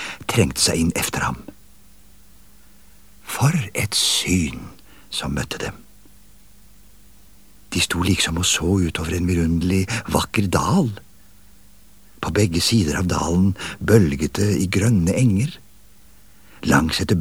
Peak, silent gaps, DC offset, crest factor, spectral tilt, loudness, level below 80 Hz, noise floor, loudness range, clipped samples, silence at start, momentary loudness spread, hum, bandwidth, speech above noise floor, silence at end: 0 dBFS; none; 0.5%; 20 dB; -4.5 dB/octave; -20 LUFS; -38 dBFS; -51 dBFS; 6 LU; under 0.1%; 0 s; 11 LU; 50 Hz at -45 dBFS; over 20 kHz; 32 dB; 0 s